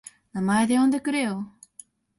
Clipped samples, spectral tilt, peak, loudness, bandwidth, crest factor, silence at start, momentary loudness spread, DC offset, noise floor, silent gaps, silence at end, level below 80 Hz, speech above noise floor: under 0.1%; -5 dB/octave; -10 dBFS; -24 LUFS; 11.5 kHz; 16 dB; 0.35 s; 15 LU; under 0.1%; -52 dBFS; none; 0.7 s; -64 dBFS; 29 dB